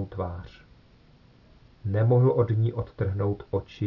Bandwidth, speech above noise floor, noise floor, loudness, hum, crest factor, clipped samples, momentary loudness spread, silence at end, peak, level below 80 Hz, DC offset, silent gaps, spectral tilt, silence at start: 6 kHz; 31 dB; -56 dBFS; -26 LUFS; none; 16 dB; under 0.1%; 16 LU; 0 s; -12 dBFS; -54 dBFS; under 0.1%; none; -11 dB/octave; 0 s